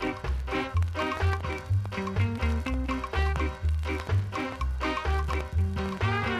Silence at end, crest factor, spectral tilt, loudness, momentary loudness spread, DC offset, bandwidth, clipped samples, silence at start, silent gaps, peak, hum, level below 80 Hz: 0 s; 14 dB; -6.5 dB/octave; -30 LUFS; 3 LU; under 0.1%; 12 kHz; under 0.1%; 0 s; none; -14 dBFS; none; -32 dBFS